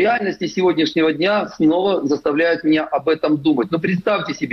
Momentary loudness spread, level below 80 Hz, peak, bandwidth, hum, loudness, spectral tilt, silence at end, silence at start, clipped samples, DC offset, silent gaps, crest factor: 3 LU; -58 dBFS; -6 dBFS; 6.4 kHz; none; -18 LUFS; -6 dB/octave; 0 s; 0 s; under 0.1%; under 0.1%; none; 12 dB